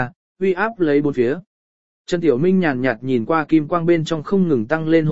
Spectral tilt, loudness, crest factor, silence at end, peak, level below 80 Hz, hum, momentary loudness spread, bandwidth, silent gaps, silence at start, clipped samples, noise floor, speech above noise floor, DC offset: -7.5 dB/octave; -19 LUFS; 16 dB; 0 s; -2 dBFS; -54 dBFS; none; 5 LU; 7.8 kHz; 0.16-0.35 s, 1.47-2.05 s; 0 s; under 0.1%; under -90 dBFS; over 73 dB; 1%